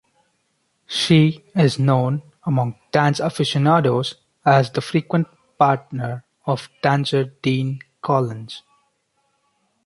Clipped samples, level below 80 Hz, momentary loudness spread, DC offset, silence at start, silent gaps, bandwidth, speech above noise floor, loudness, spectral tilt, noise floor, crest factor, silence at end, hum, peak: under 0.1%; -60 dBFS; 12 LU; under 0.1%; 0.9 s; none; 11.5 kHz; 50 dB; -20 LUFS; -6.5 dB/octave; -68 dBFS; 18 dB; 1.25 s; none; -2 dBFS